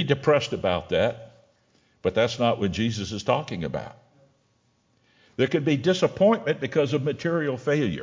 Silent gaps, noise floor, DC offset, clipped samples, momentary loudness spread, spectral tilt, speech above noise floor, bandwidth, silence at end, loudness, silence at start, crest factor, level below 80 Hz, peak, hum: none; -67 dBFS; under 0.1%; under 0.1%; 10 LU; -6 dB/octave; 43 dB; 7.6 kHz; 0 s; -24 LUFS; 0 s; 20 dB; -52 dBFS; -6 dBFS; none